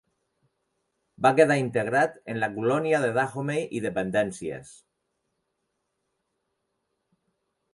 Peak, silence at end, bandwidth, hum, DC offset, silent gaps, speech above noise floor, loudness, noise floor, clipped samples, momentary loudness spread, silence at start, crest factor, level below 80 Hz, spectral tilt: -4 dBFS; 3 s; 11.5 kHz; none; under 0.1%; none; 54 dB; -25 LUFS; -79 dBFS; under 0.1%; 10 LU; 1.2 s; 24 dB; -66 dBFS; -6 dB/octave